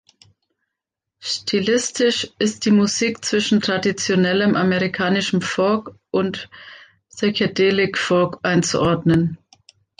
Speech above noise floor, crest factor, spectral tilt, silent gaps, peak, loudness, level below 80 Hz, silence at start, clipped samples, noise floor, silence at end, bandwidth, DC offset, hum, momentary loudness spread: 64 dB; 14 dB; -4.5 dB/octave; none; -6 dBFS; -19 LUFS; -54 dBFS; 1.2 s; under 0.1%; -83 dBFS; 0.65 s; 9.8 kHz; under 0.1%; none; 8 LU